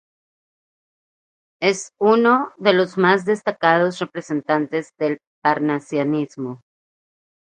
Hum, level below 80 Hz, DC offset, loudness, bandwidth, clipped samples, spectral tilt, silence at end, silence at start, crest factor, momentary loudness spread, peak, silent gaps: none; -70 dBFS; under 0.1%; -19 LUFS; 9.8 kHz; under 0.1%; -5.5 dB/octave; 0.9 s; 1.6 s; 20 dB; 10 LU; 0 dBFS; 5.27-5.42 s